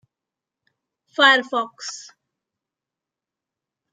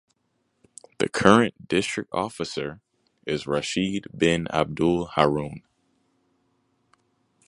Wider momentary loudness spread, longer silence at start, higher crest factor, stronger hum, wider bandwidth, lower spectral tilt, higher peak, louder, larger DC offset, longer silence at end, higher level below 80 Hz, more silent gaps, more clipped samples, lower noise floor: first, 18 LU vs 13 LU; first, 1.2 s vs 1 s; about the same, 24 dB vs 26 dB; neither; second, 9.6 kHz vs 11.5 kHz; second, 0 dB/octave vs -5 dB/octave; about the same, -2 dBFS vs 0 dBFS; first, -17 LUFS vs -24 LUFS; neither; about the same, 1.9 s vs 1.9 s; second, -86 dBFS vs -54 dBFS; neither; neither; first, -87 dBFS vs -73 dBFS